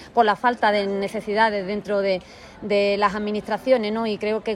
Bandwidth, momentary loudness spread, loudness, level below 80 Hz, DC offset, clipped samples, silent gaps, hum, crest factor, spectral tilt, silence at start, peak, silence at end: 12.5 kHz; 7 LU; -22 LUFS; -56 dBFS; under 0.1%; under 0.1%; none; none; 16 dB; -5.5 dB/octave; 0 s; -6 dBFS; 0 s